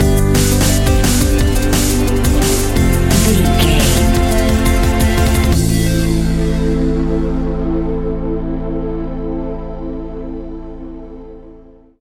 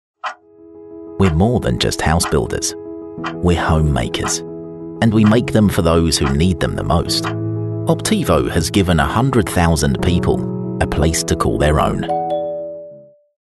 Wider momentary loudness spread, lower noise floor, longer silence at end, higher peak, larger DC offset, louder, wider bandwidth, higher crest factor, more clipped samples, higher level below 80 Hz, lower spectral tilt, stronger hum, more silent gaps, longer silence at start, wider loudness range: about the same, 14 LU vs 14 LU; about the same, -40 dBFS vs -41 dBFS; second, 0.35 s vs 0.5 s; about the same, 0 dBFS vs -2 dBFS; first, 0.6% vs under 0.1%; about the same, -15 LUFS vs -16 LUFS; first, 17 kHz vs 12.5 kHz; about the same, 14 dB vs 16 dB; neither; first, -18 dBFS vs -28 dBFS; about the same, -5 dB/octave vs -5.5 dB/octave; neither; neither; second, 0 s vs 0.25 s; first, 11 LU vs 3 LU